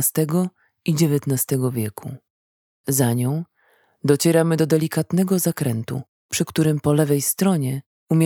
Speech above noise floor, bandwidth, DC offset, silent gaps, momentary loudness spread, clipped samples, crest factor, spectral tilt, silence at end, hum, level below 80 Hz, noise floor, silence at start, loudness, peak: 41 dB; 19 kHz; under 0.1%; 2.30-2.84 s, 6.08-6.29 s, 7.86-8.07 s; 11 LU; under 0.1%; 18 dB; -5.5 dB/octave; 0 s; none; -62 dBFS; -61 dBFS; 0 s; -21 LUFS; -2 dBFS